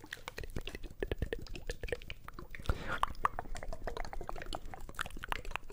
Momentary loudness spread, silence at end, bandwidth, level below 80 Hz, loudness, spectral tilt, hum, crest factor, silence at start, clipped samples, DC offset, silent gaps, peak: 9 LU; 0 s; 16 kHz; -44 dBFS; -42 LUFS; -4.5 dB/octave; none; 26 dB; 0 s; under 0.1%; under 0.1%; none; -12 dBFS